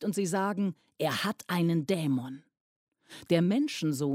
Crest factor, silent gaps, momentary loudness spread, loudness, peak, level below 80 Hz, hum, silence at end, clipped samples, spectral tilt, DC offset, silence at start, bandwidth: 18 dB; 2.60-2.92 s; 7 LU; -30 LUFS; -14 dBFS; -76 dBFS; none; 0 s; under 0.1%; -5.5 dB/octave; under 0.1%; 0 s; 16 kHz